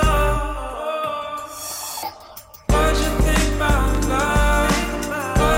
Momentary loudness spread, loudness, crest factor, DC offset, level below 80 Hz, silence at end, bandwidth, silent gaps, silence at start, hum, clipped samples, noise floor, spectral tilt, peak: 12 LU; -21 LUFS; 12 dB; under 0.1%; -24 dBFS; 0 s; 17 kHz; none; 0 s; none; under 0.1%; -41 dBFS; -4.5 dB/octave; -8 dBFS